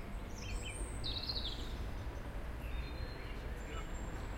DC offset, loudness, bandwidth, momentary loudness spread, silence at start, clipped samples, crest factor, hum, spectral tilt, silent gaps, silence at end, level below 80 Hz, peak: under 0.1%; -44 LUFS; 16.5 kHz; 7 LU; 0 s; under 0.1%; 14 dB; none; -4 dB/octave; none; 0 s; -44 dBFS; -28 dBFS